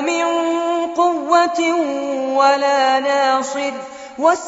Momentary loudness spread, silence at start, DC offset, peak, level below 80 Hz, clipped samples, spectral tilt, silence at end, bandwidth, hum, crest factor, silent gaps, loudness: 8 LU; 0 s; under 0.1%; -2 dBFS; -66 dBFS; under 0.1%; 0 dB/octave; 0 s; 8 kHz; none; 16 dB; none; -17 LUFS